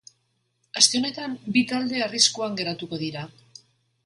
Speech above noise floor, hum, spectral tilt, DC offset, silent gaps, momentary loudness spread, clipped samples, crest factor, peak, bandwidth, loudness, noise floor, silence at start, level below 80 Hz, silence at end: 47 dB; none; -2 dB/octave; under 0.1%; none; 15 LU; under 0.1%; 26 dB; -2 dBFS; 11.5 kHz; -23 LUFS; -72 dBFS; 0.75 s; -70 dBFS; 0.75 s